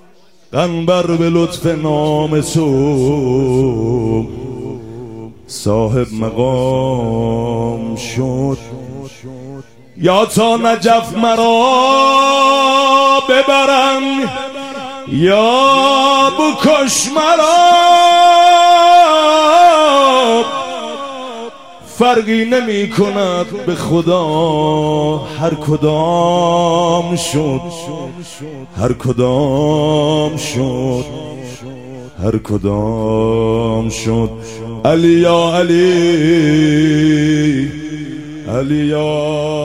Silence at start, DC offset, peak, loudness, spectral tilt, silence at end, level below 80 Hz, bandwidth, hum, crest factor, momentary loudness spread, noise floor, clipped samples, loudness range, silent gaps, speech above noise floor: 0.55 s; 0.6%; 0 dBFS; -12 LUFS; -5 dB/octave; 0 s; -40 dBFS; 16 kHz; none; 12 dB; 18 LU; -49 dBFS; under 0.1%; 9 LU; none; 36 dB